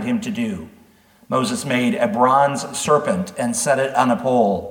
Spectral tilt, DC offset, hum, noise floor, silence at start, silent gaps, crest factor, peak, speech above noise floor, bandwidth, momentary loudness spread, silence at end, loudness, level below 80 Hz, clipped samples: -4.5 dB/octave; under 0.1%; none; -52 dBFS; 0 s; none; 18 dB; -2 dBFS; 33 dB; 18 kHz; 8 LU; 0 s; -19 LUFS; -58 dBFS; under 0.1%